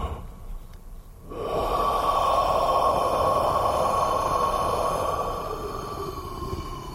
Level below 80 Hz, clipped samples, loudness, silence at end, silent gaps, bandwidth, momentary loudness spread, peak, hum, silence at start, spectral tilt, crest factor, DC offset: -38 dBFS; under 0.1%; -25 LUFS; 0 s; none; 16 kHz; 13 LU; -10 dBFS; none; 0 s; -5 dB/octave; 16 dB; under 0.1%